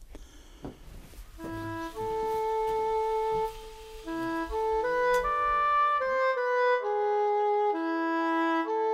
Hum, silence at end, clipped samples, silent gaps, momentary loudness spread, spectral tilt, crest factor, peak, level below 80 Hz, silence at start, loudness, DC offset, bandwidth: none; 0 s; under 0.1%; none; 15 LU; -5 dB/octave; 12 dB; -16 dBFS; -50 dBFS; 0 s; -28 LUFS; under 0.1%; 15.5 kHz